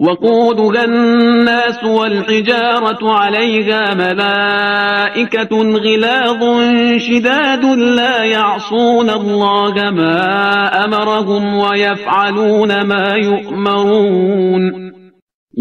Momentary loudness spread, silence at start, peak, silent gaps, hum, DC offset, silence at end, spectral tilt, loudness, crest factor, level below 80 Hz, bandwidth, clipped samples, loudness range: 3 LU; 0 s; 0 dBFS; 15.22-15.27 s, 15.34-15.47 s; none; under 0.1%; 0 s; -5.5 dB/octave; -12 LUFS; 12 dB; -56 dBFS; 7 kHz; under 0.1%; 1 LU